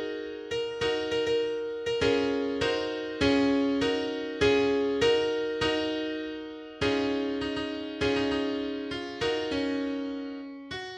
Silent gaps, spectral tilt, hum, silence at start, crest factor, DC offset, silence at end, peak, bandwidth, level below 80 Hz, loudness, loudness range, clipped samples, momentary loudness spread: none; -5 dB/octave; none; 0 s; 16 dB; under 0.1%; 0 s; -12 dBFS; 10 kHz; -52 dBFS; -29 LUFS; 4 LU; under 0.1%; 11 LU